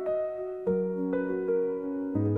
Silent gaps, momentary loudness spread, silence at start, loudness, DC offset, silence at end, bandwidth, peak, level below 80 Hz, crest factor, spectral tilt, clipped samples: none; 4 LU; 0 s; -30 LUFS; under 0.1%; 0 s; 3.8 kHz; -16 dBFS; -64 dBFS; 12 dB; -11.5 dB/octave; under 0.1%